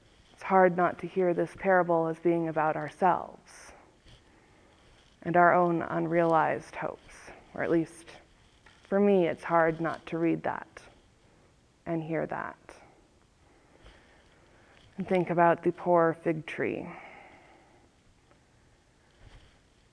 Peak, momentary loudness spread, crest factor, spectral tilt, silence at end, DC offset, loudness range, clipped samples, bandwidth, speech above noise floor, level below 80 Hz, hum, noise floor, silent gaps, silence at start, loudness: -8 dBFS; 21 LU; 22 dB; -7.5 dB/octave; 2.75 s; under 0.1%; 12 LU; under 0.1%; 10.5 kHz; 36 dB; -64 dBFS; none; -63 dBFS; none; 0.4 s; -28 LUFS